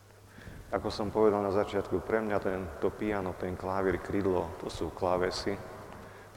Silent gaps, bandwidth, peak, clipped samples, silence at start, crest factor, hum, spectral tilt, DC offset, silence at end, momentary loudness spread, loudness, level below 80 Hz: none; 16.5 kHz; -12 dBFS; under 0.1%; 0.05 s; 20 dB; none; -6 dB/octave; under 0.1%; 0 s; 18 LU; -32 LUFS; -52 dBFS